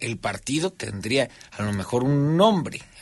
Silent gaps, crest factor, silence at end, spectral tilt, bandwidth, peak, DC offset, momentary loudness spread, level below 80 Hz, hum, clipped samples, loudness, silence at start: none; 18 dB; 0 s; -5.5 dB/octave; 11.5 kHz; -6 dBFS; under 0.1%; 12 LU; -54 dBFS; none; under 0.1%; -24 LUFS; 0 s